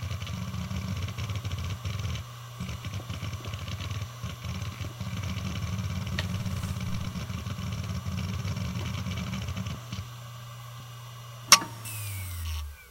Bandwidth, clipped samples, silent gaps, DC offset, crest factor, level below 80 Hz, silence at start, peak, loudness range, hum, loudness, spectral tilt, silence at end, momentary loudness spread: 16.5 kHz; under 0.1%; none; under 0.1%; 32 dB; -44 dBFS; 0 s; 0 dBFS; 8 LU; none; -31 LUFS; -3 dB/octave; 0 s; 8 LU